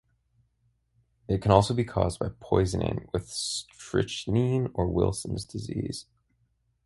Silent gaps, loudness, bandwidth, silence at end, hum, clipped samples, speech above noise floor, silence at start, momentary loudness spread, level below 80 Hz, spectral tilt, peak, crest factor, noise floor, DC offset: none; -28 LUFS; 11.5 kHz; 0.85 s; none; under 0.1%; 44 dB; 1.3 s; 12 LU; -44 dBFS; -6 dB/octave; -4 dBFS; 26 dB; -72 dBFS; under 0.1%